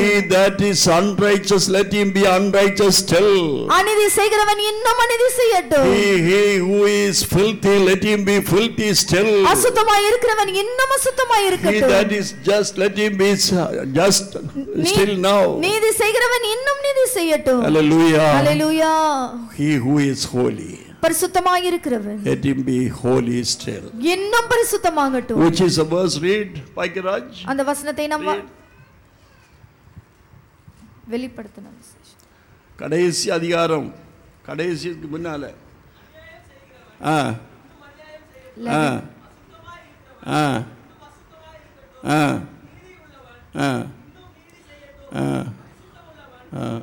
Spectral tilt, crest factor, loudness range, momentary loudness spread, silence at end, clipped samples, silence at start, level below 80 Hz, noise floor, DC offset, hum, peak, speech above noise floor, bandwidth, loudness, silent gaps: -4 dB/octave; 12 dB; 14 LU; 14 LU; 0 s; under 0.1%; 0 s; -48 dBFS; -51 dBFS; under 0.1%; none; -6 dBFS; 34 dB; 19 kHz; -17 LUFS; none